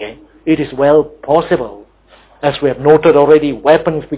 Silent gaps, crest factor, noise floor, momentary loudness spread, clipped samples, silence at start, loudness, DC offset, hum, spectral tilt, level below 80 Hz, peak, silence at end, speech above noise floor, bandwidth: none; 12 dB; -46 dBFS; 10 LU; under 0.1%; 0 s; -12 LUFS; under 0.1%; none; -10.5 dB/octave; -44 dBFS; 0 dBFS; 0 s; 35 dB; 4 kHz